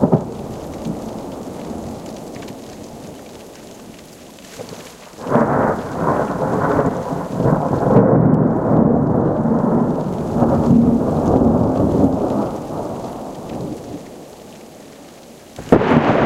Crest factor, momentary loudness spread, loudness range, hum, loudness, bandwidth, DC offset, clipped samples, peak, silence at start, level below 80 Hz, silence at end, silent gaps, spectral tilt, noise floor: 18 dB; 23 LU; 16 LU; none; -17 LUFS; 14.5 kHz; under 0.1%; under 0.1%; 0 dBFS; 0 s; -38 dBFS; 0 s; none; -8.5 dB/octave; -40 dBFS